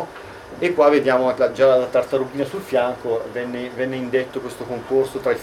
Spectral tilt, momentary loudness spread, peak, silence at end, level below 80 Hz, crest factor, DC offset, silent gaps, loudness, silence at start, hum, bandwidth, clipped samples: -6 dB/octave; 14 LU; -2 dBFS; 0 s; -56 dBFS; 18 dB; under 0.1%; none; -20 LUFS; 0 s; none; 15.5 kHz; under 0.1%